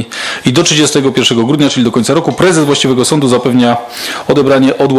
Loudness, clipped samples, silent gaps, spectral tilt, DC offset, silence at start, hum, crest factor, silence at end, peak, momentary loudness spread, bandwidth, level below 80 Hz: -10 LUFS; under 0.1%; none; -4.5 dB/octave; under 0.1%; 0 s; none; 10 dB; 0 s; 0 dBFS; 5 LU; 14.5 kHz; -46 dBFS